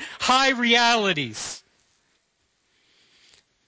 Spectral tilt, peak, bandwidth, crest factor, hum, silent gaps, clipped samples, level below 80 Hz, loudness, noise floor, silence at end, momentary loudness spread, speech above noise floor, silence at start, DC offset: -2 dB/octave; -6 dBFS; 8 kHz; 20 dB; none; none; under 0.1%; -62 dBFS; -20 LUFS; -70 dBFS; 2.1 s; 16 LU; 50 dB; 0 s; under 0.1%